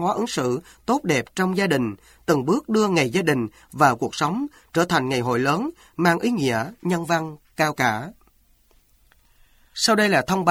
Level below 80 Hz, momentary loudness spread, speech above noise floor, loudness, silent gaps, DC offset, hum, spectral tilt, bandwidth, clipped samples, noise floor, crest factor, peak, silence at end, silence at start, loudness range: -56 dBFS; 10 LU; 37 dB; -22 LUFS; none; under 0.1%; none; -5 dB/octave; 16.5 kHz; under 0.1%; -59 dBFS; 20 dB; -2 dBFS; 0 s; 0 s; 4 LU